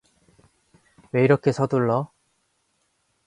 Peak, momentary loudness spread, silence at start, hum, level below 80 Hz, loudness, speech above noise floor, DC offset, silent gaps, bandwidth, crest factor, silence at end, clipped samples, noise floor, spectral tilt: -4 dBFS; 9 LU; 1.15 s; none; -64 dBFS; -22 LUFS; 50 dB; under 0.1%; none; 11 kHz; 20 dB; 1.2 s; under 0.1%; -70 dBFS; -8 dB/octave